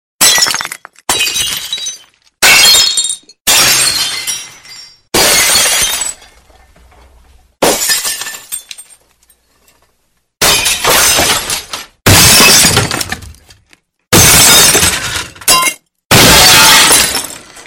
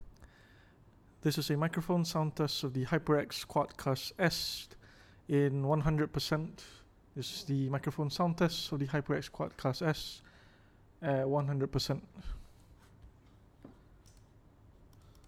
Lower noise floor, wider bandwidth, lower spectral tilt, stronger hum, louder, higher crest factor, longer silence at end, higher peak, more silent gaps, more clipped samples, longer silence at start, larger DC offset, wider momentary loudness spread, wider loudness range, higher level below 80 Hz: about the same, -60 dBFS vs -62 dBFS; first, over 20 kHz vs 16.5 kHz; second, -1 dB/octave vs -5.5 dB/octave; neither; first, -6 LUFS vs -34 LUFS; second, 10 dB vs 20 dB; about the same, 0.05 s vs 0.05 s; first, 0 dBFS vs -16 dBFS; first, 3.41-3.45 s, 16.05-16.10 s vs none; first, 0.6% vs under 0.1%; first, 0.2 s vs 0 s; neither; first, 17 LU vs 14 LU; first, 11 LU vs 4 LU; first, -32 dBFS vs -56 dBFS